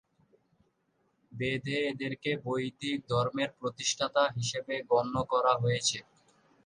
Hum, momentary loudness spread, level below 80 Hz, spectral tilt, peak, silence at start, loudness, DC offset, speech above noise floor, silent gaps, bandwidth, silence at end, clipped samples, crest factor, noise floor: none; 7 LU; -64 dBFS; -4 dB/octave; -12 dBFS; 1.3 s; -31 LUFS; under 0.1%; 44 dB; none; 11 kHz; 0.65 s; under 0.1%; 20 dB; -75 dBFS